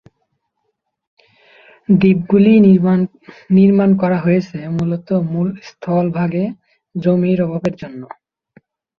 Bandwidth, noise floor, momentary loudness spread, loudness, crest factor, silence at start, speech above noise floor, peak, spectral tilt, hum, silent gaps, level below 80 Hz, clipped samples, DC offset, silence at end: 6 kHz; -71 dBFS; 17 LU; -15 LUFS; 14 dB; 1.9 s; 57 dB; -2 dBFS; -10 dB/octave; none; none; -54 dBFS; under 0.1%; under 0.1%; 0.95 s